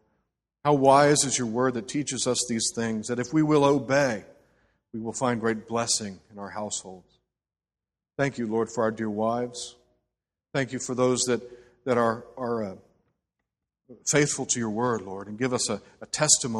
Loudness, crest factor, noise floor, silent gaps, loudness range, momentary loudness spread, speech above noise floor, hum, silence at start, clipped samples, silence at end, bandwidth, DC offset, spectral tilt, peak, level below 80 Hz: -26 LUFS; 24 dB; under -90 dBFS; none; 7 LU; 15 LU; over 64 dB; none; 0.65 s; under 0.1%; 0 s; 13 kHz; under 0.1%; -3.5 dB/octave; -4 dBFS; -64 dBFS